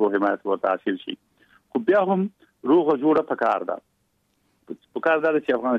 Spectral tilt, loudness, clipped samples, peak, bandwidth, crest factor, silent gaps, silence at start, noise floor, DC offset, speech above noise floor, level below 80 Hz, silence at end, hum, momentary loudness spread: -8 dB/octave; -23 LUFS; under 0.1%; -8 dBFS; 6 kHz; 14 dB; none; 0 s; -69 dBFS; under 0.1%; 47 dB; -72 dBFS; 0 s; none; 15 LU